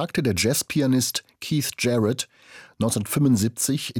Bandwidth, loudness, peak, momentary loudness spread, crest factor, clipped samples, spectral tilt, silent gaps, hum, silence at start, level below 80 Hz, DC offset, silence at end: over 20 kHz; -23 LUFS; -10 dBFS; 7 LU; 14 dB; under 0.1%; -4.5 dB/octave; none; none; 0 s; -58 dBFS; under 0.1%; 0 s